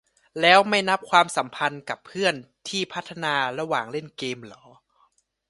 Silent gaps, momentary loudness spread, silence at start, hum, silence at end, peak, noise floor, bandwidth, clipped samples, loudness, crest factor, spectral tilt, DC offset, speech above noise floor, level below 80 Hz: none; 16 LU; 0.35 s; none; 0.95 s; 0 dBFS; -66 dBFS; 11.5 kHz; under 0.1%; -23 LUFS; 24 dB; -3 dB/octave; under 0.1%; 42 dB; -70 dBFS